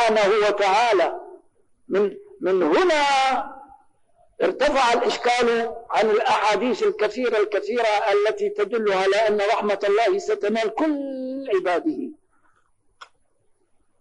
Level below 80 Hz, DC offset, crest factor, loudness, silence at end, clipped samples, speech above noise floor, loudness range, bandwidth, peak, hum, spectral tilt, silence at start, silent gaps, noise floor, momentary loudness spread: -58 dBFS; under 0.1%; 10 dB; -21 LUFS; 0.95 s; under 0.1%; 43 dB; 4 LU; 10 kHz; -12 dBFS; none; -3.5 dB/octave; 0 s; none; -64 dBFS; 8 LU